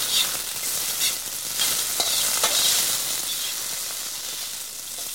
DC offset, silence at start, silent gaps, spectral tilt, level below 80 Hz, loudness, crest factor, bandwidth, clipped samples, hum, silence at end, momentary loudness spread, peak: 0.2%; 0 s; none; 1.5 dB/octave; -58 dBFS; -22 LUFS; 20 dB; 17.5 kHz; under 0.1%; none; 0 s; 10 LU; -6 dBFS